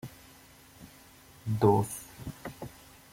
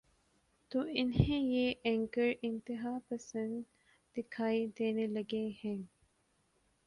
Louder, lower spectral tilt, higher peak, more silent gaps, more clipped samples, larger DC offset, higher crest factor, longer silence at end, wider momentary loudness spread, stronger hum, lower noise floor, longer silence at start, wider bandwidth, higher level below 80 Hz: first, -30 LUFS vs -36 LUFS; about the same, -7 dB/octave vs -7 dB/octave; about the same, -12 dBFS vs -14 dBFS; neither; neither; neither; about the same, 22 dB vs 24 dB; second, 0.4 s vs 1 s; first, 27 LU vs 12 LU; neither; second, -55 dBFS vs -76 dBFS; second, 0.05 s vs 0.7 s; first, 16.5 kHz vs 11 kHz; about the same, -60 dBFS vs -56 dBFS